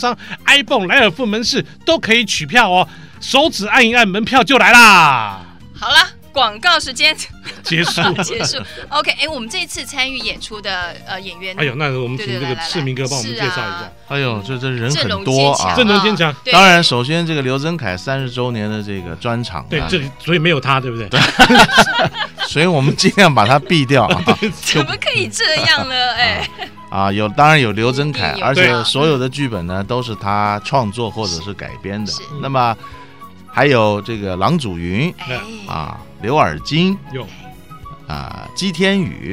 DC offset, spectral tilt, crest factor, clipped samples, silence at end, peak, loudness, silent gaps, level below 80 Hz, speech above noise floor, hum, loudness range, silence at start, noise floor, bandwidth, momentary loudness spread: 0.8%; -4 dB/octave; 16 dB; under 0.1%; 0 s; 0 dBFS; -14 LUFS; none; -42 dBFS; 23 dB; none; 10 LU; 0 s; -38 dBFS; 16.5 kHz; 15 LU